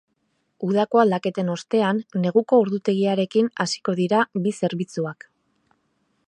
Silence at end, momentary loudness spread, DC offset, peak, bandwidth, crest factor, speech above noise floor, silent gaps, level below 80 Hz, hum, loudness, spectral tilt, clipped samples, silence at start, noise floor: 1.15 s; 9 LU; under 0.1%; -4 dBFS; 10.5 kHz; 20 dB; 50 dB; none; -72 dBFS; none; -22 LUFS; -6 dB/octave; under 0.1%; 0.6 s; -71 dBFS